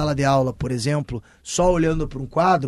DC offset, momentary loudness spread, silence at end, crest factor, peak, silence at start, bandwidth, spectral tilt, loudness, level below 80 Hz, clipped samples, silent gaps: under 0.1%; 8 LU; 0 s; 14 dB; -6 dBFS; 0 s; 12.5 kHz; -5.5 dB/octave; -21 LUFS; -36 dBFS; under 0.1%; none